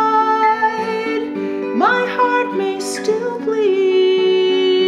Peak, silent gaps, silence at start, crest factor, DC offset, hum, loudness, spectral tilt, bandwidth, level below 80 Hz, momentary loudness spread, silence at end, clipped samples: -2 dBFS; none; 0 s; 14 dB; under 0.1%; none; -16 LUFS; -4 dB/octave; 12 kHz; -66 dBFS; 7 LU; 0 s; under 0.1%